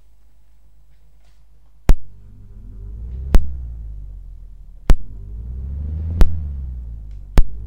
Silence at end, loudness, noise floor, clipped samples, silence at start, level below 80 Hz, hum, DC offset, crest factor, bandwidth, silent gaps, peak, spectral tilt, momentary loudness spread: 0 s; -25 LUFS; -53 dBFS; under 0.1%; 1.9 s; -20 dBFS; none; 0.8%; 18 dB; 6.8 kHz; none; 0 dBFS; -7 dB/octave; 21 LU